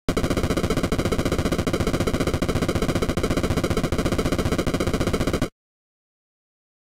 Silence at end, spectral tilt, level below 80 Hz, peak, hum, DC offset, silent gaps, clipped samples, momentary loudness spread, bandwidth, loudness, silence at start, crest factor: 1.4 s; -5.5 dB/octave; -32 dBFS; -8 dBFS; none; under 0.1%; none; under 0.1%; 1 LU; 17 kHz; -24 LUFS; 0.1 s; 16 dB